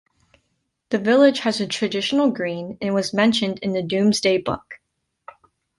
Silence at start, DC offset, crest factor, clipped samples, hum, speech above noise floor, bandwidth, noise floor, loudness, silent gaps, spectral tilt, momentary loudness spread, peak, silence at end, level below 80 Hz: 0.9 s; under 0.1%; 18 dB; under 0.1%; none; 53 dB; 11.5 kHz; -72 dBFS; -20 LUFS; none; -4.5 dB/octave; 11 LU; -4 dBFS; 1.05 s; -58 dBFS